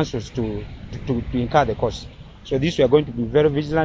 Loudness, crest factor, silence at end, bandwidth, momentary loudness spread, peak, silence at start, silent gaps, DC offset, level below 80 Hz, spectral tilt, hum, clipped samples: -21 LUFS; 18 dB; 0 s; 7.8 kHz; 17 LU; -2 dBFS; 0 s; none; under 0.1%; -38 dBFS; -7 dB/octave; none; under 0.1%